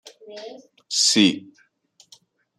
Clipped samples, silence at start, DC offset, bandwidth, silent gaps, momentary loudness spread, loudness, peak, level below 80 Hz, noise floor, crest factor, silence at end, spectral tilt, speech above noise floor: under 0.1%; 0.05 s; under 0.1%; 13.5 kHz; none; 25 LU; -18 LUFS; -4 dBFS; -72 dBFS; -59 dBFS; 22 dB; 1.2 s; -2 dB/octave; 38 dB